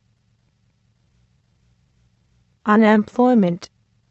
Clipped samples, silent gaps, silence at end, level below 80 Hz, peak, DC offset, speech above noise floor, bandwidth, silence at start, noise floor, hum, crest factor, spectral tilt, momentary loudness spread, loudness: under 0.1%; none; 0.45 s; -64 dBFS; -2 dBFS; under 0.1%; 48 dB; 7.6 kHz; 2.65 s; -63 dBFS; none; 18 dB; -7.5 dB/octave; 13 LU; -17 LUFS